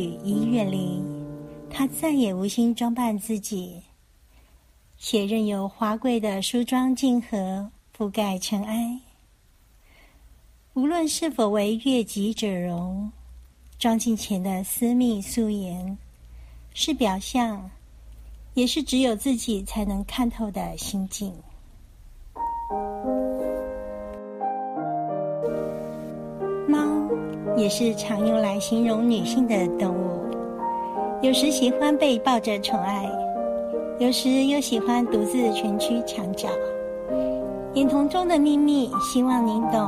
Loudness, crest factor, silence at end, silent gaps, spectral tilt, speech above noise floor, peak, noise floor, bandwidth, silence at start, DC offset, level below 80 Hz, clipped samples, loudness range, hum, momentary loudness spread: -25 LUFS; 18 dB; 0 s; none; -5 dB/octave; 34 dB; -8 dBFS; -57 dBFS; 15.5 kHz; 0 s; under 0.1%; -48 dBFS; under 0.1%; 7 LU; none; 11 LU